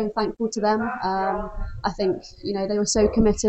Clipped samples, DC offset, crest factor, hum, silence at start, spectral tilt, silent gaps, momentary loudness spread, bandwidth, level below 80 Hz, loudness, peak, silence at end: under 0.1%; under 0.1%; 16 dB; none; 0 s; -4.5 dB/octave; none; 10 LU; 8.8 kHz; -36 dBFS; -24 LUFS; -6 dBFS; 0 s